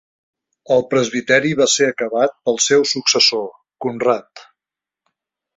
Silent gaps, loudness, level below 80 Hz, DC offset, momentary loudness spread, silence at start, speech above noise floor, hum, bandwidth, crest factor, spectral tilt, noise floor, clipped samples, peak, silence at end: none; -16 LUFS; -62 dBFS; under 0.1%; 10 LU; 0.7 s; 71 dB; none; 8 kHz; 18 dB; -2.5 dB/octave; -88 dBFS; under 0.1%; -2 dBFS; 1.15 s